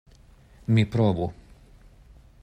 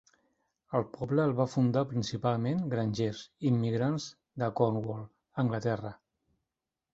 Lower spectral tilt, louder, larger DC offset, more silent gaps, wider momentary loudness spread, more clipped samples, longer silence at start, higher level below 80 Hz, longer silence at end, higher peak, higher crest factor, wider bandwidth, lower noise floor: about the same, -8.5 dB/octave vs -7.5 dB/octave; first, -24 LUFS vs -31 LUFS; neither; neither; first, 12 LU vs 9 LU; neither; about the same, 0.7 s vs 0.7 s; first, -50 dBFS vs -64 dBFS; about the same, 1.1 s vs 1 s; about the same, -12 dBFS vs -12 dBFS; about the same, 16 dB vs 20 dB; first, 8.8 kHz vs 7.8 kHz; second, -53 dBFS vs -89 dBFS